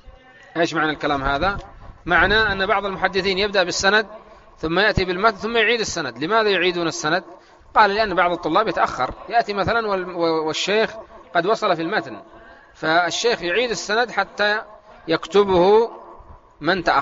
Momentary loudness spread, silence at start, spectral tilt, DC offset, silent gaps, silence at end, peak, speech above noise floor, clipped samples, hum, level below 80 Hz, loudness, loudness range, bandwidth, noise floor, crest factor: 9 LU; 0.05 s; -2 dB/octave; under 0.1%; none; 0 s; 0 dBFS; 26 dB; under 0.1%; none; -42 dBFS; -20 LUFS; 3 LU; 8 kHz; -45 dBFS; 20 dB